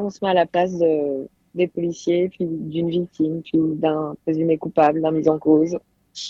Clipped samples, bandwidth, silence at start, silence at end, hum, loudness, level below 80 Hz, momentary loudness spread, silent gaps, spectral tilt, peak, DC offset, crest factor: under 0.1%; 7.6 kHz; 0 s; 0 s; none; -21 LUFS; -60 dBFS; 8 LU; none; -7 dB/octave; -4 dBFS; under 0.1%; 18 dB